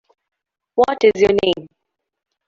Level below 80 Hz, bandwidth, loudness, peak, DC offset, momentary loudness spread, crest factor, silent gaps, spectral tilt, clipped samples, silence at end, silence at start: -52 dBFS; 7.4 kHz; -17 LUFS; -2 dBFS; under 0.1%; 10 LU; 16 dB; none; -5 dB/octave; under 0.1%; 0.8 s; 0.75 s